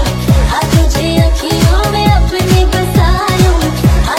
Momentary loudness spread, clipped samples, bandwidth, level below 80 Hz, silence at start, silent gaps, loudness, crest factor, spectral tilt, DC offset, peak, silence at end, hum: 1 LU; 0.4%; 16.5 kHz; -14 dBFS; 0 s; none; -11 LUFS; 10 dB; -5.5 dB/octave; under 0.1%; 0 dBFS; 0 s; none